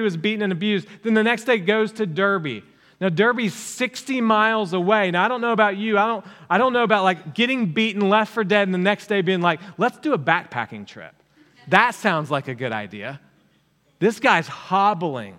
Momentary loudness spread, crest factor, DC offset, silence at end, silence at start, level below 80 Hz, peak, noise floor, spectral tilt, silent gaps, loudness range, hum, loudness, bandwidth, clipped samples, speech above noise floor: 9 LU; 22 dB; under 0.1%; 0.05 s; 0 s; -74 dBFS; 0 dBFS; -62 dBFS; -5.5 dB/octave; none; 4 LU; none; -20 LUFS; 15.5 kHz; under 0.1%; 41 dB